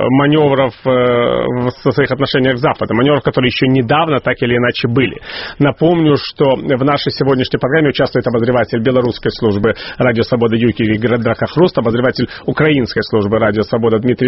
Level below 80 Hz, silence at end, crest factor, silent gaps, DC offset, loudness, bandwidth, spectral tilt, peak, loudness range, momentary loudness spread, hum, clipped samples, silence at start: -42 dBFS; 0 s; 12 dB; none; under 0.1%; -13 LUFS; 6 kHz; -5 dB/octave; 0 dBFS; 1 LU; 4 LU; none; under 0.1%; 0 s